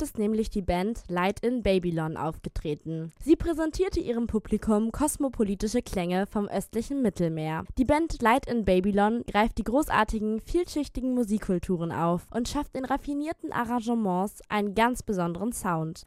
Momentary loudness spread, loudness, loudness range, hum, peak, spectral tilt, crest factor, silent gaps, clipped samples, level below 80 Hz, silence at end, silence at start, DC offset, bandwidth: 7 LU; -28 LUFS; 4 LU; none; -10 dBFS; -6 dB/octave; 18 dB; none; under 0.1%; -42 dBFS; 0.05 s; 0 s; under 0.1%; 15.5 kHz